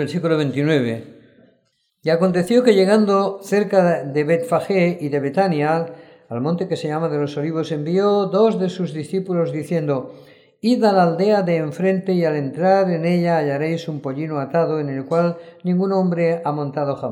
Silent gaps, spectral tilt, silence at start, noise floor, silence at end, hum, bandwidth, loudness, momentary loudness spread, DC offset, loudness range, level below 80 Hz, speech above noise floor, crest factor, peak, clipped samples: none; -7.5 dB/octave; 0 s; -66 dBFS; 0 s; none; 13 kHz; -19 LUFS; 9 LU; under 0.1%; 4 LU; -68 dBFS; 47 dB; 18 dB; -2 dBFS; under 0.1%